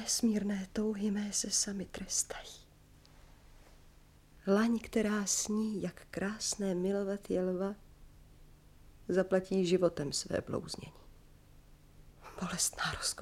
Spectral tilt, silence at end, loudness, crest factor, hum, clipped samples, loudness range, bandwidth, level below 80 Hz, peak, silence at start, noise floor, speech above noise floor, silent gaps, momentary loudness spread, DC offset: -3.5 dB/octave; 0 s; -34 LUFS; 20 dB; none; under 0.1%; 4 LU; 16 kHz; -58 dBFS; -16 dBFS; 0 s; -60 dBFS; 26 dB; none; 12 LU; under 0.1%